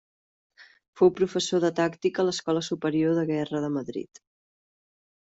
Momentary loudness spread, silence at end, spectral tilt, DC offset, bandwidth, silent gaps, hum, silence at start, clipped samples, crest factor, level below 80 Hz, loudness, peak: 9 LU; 1.2 s; -5.5 dB/octave; under 0.1%; 8 kHz; 0.88-0.93 s; none; 0.6 s; under 0.1%; 18 dB; -68 dBFS; -26 LUFS; -8 dBFS